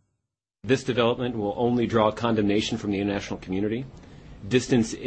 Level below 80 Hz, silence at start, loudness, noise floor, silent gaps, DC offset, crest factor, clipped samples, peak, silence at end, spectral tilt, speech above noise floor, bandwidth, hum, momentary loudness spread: -50 dBFS; 0.65 s; -25 LUFS; -82 dBFS; none; under 0.1%; 20 dB; under 0.1%; -6 dBFS; 0 s; -5.5 dB/octave; 58 dB; 8.8 kHz; none; 9 LU